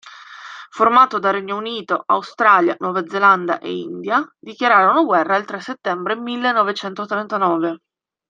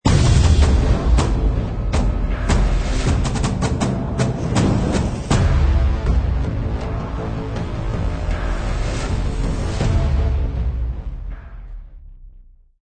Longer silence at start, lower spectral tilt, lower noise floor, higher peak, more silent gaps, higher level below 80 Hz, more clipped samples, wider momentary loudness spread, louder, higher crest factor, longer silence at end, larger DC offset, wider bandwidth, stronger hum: about the same, 0.05 s vs 0.05 s; about the same, -5.5 dB/octave vs -6.5 dB/octave; second, -38 dBFS vs -45 dBFS; about the same, -2 dBFS vs -2 dBFS; neither; second, -70 dBFS vs -20 dBFS; neither; first, 14 LU vs 9 LU; first, -17 LUFS vs -20 LUFS; about the same, 18 dB vs 16 dB; about the same, 0.55 s vs 0.45 s; second, under 0.1% vs 0.3%; second, 7.6 kHz vs 9.4 kHz; neither